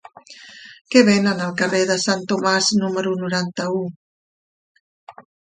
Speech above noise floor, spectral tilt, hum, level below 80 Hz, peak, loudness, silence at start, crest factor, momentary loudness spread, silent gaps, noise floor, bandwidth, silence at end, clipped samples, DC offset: 25 dB; -4 dB/octave; none; -64 dBFS; 0 dBFS; -19 LUFS; 0.3 s; 20 dB; 14 LU; 0.81-0.85 s, 3.96-5.07 s; -43 dBFS; 9.6 kHz; 0.35 s; under 0.1%; under 0.1%